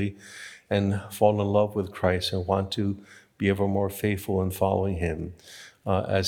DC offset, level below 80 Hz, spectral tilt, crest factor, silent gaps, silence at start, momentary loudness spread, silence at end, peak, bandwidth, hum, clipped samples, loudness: under 0.1%; -54 dBFS; -6 dB/octave; 20 dB; none; 0 s; 15 LU; 0 s; -6 dBFS; 18 kHz; none; under 0.1%; -26 LUFS